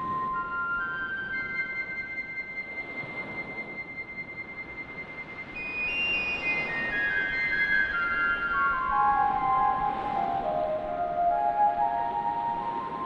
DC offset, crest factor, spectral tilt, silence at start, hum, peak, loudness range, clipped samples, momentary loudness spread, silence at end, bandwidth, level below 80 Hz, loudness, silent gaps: under 0.1%; 14 dB; -5.5 dB/octave; 0 s; none; -14 dBFS; 9 LU; under 0.1%; 12 LU; 0 s; 7.6 kHz; -54 dBFS; -28 LUFS; none